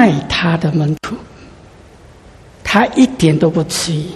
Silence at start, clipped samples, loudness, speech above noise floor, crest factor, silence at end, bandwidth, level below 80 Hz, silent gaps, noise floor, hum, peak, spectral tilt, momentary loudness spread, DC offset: 0 s; under 0.1%; -14 LUFS; 27 dB; 16 dB; 0 s; 13.5 kHz; -40 dBFS; none; -41 dBFS; none; 0 dBFS; -5.5 dB/octave; 13 LU; under 0.1%